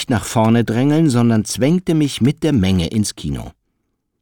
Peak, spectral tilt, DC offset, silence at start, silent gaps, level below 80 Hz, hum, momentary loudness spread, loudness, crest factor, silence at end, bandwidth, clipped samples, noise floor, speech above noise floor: -4 dBFS; -6 dB/octave; under 0.1%; 0 s; none; -40 dBFS; none; 7 LU; -16 LUFS; 12 dB; 0.7 s; 19.5 kHz; under 0.1%; -70 dBFS; 55 dB